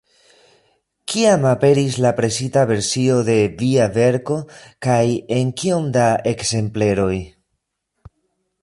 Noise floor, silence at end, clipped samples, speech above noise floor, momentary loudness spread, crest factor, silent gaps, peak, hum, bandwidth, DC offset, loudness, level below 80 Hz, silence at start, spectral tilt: -74 dBFS; 1.35 s; under 0.1%; 57 dB; 9 LU; 16 dB; none; -4 dBFS; none; 11.5 kHz; under 0.1%; -18 LUFS; -48 dBFS; 1.1 s; -5.5 dB/octave